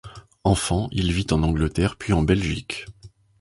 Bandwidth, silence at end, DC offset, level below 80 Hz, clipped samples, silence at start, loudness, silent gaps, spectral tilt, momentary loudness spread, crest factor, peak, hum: 11.5 kHz; 0.35 s; under 0.1%; -34 dBFS; under 0.1%; 0.05 s; -23 LUFS; none; -5.5 dB/octave; 10 LU; 18 dB; -4 dBFS; none